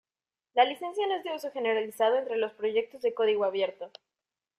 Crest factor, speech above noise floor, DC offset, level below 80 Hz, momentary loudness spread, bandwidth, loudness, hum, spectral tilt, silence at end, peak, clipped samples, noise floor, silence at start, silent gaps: 20 dB; over 62 dB; under 0.1%; -80 dBFS; 7 LU; 14.5 kHz; -29 LUFS; none; -3.5 dB/octave; 0.7 s; -10 dBFS; under 0.1%; under -90 dBFS; 0.55 s; none